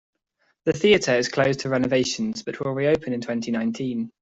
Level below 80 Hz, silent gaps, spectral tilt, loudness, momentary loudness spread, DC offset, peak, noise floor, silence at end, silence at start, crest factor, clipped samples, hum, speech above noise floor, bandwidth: -56 dBFS; none; -5 dB/octave; -23 LUFS; 10 LU; under 0.1%; -4 dBFS; -70 dBFS; 0.1 s; 0.65 s; 18 dB; under 0.1%; none; 47 dB; 8 kHz